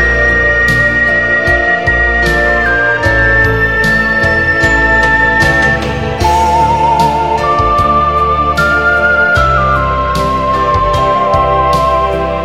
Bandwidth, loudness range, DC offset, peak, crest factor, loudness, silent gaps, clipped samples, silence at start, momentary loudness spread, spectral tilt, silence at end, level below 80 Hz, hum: 16 kHz; 1 LU; 1%; 0 dBFS; 10 dB; -9 LUFS; none; under 0.1%; 0 s; 4 LU; -5.5 dB/octave; 0 s; -22 dBFS; none